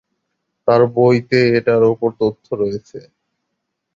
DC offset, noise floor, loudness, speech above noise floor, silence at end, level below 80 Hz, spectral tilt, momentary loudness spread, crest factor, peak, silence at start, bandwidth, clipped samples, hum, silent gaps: under 0.1%; -75 dBFS; -16 LUFS; 60 dB; 0.95 s; -54 dBFS; -8 dB/octave; 9 LU; 16 dB; -2 dBFS; 0.65 s; 7.4 kHz; under 0.1%; none; none